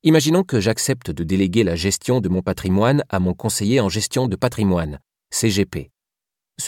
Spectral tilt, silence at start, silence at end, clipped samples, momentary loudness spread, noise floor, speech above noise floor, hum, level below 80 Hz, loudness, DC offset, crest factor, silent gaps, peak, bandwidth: -5 dB/octave; 0.05 s; 0 s; under 0.1%; 6 LU; -87 dBFS; 68 dB; none; -44 dBFS; -19 LUFS; under 0.1%; 16 dB; none; -4 dBFS; 17 kHz